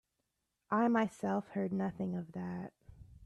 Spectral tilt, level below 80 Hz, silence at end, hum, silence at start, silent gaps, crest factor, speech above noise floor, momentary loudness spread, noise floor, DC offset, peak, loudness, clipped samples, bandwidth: -8 dB/octave; -68 dBFS; 0 s; none; 0.7 s; none; 18 dB; 50 dB; 12 LU; -85 dBFS; under 0.1%; -20 dBFS; -36 LUFS; under 0.1%; 11.5 kHz